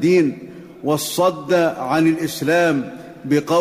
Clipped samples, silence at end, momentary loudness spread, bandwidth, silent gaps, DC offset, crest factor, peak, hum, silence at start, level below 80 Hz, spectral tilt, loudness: under 0.1%; 0 s; 15 LU; 16 kHz; none; under 0.1%; 12 dB; -6 dBFS; none; 0 s; -60 dBFS; -5 dB/octave; -19 LUFS